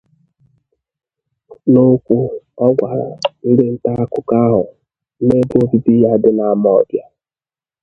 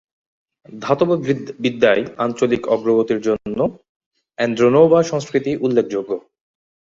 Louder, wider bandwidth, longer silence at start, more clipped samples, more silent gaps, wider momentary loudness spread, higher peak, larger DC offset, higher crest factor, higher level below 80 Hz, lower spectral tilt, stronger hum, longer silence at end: first, -14 LUFS vs -18 LUFS; second, 6.4 kHz vs 7.6 kHz; first, 1.5 s vs 0.7 s; neither; second, none vs 3.89-4.11 s; about the same, 9 LU vs 10 LU; about the same, 0 dBFS vs 0 dBFS; neither; about the same, 14 dB vs 18 dB; first, -50 dBFS vs -58 dBFS; first, -9 dB/octave vs -6.5 dB/octave; neither; first, 0.8 s vs 0.65 s